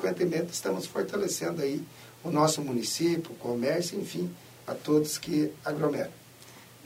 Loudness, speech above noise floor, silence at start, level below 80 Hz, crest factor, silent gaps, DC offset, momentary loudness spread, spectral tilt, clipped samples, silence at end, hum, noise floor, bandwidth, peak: -30 LUFS; 22 dB; 0 s; -70 dBFS; 18 dB; none; under 0.1%; 14 LU; -4.5 dB/octave; under 0.1%; 0 s; none; -51 dBFS; 16 kHz; -12 dBFS